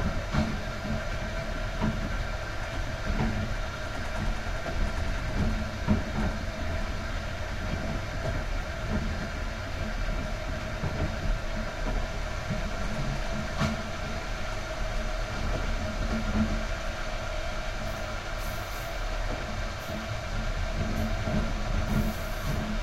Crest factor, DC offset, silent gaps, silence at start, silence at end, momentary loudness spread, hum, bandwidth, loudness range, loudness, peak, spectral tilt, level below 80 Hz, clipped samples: 18 dB; under 0.1%; none; 0 s; 0 s; 5 LU; none; 16 kHz; 2 LU; -33 LUFS; -12 dBFS; -5.5 dB/octave; -34 dBFS; under 0.1%